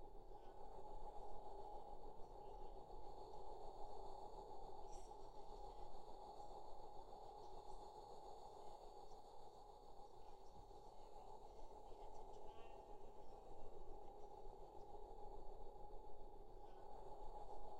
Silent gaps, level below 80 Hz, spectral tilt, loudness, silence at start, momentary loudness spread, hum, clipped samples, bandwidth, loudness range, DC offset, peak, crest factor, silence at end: none; -60 dBFS; -5.5 dB/octave; -60 LUFS; 0 s; 5 LU; none; under 0.1%; 9 kHz; 4 LU; under 0.1%; -38 dBFS; 14 dB; 0 s